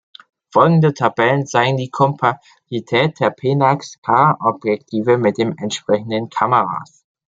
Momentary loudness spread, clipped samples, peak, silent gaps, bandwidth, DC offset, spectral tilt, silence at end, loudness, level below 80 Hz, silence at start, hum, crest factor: 9 LU; under 0.1%; -2 dBFS; 3.98-4.02 s; 7.8 kHz; under 0.1%; -6 dB/octave; 0.45 s; -17 LUFS; -62 dBFS; 0.55 s; none; 16 dB